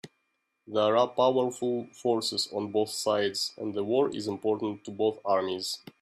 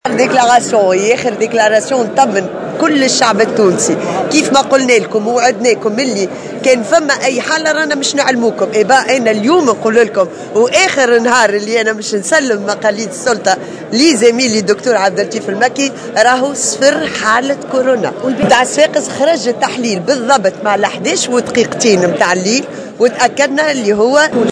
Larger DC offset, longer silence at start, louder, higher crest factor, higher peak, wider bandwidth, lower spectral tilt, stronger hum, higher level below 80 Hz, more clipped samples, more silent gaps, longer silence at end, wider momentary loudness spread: neither; about the same, 0.05 s vs 0.05 s; second, -29 LUFS vs -11 LUFS; first, 18 dB vs 12 dB; second, -12 dBFS vs 0 dBFS; first, 15 kHz vs 11 kHz; about the same, -4 dB/octave vs -3 dB/octave; neither; second, -74 dBFS vs -54 dBFS; second, under 0.1% vs 0.2%; neither; first, 0.25 s vs 0 s; about the same, 7 LU vs 6 LU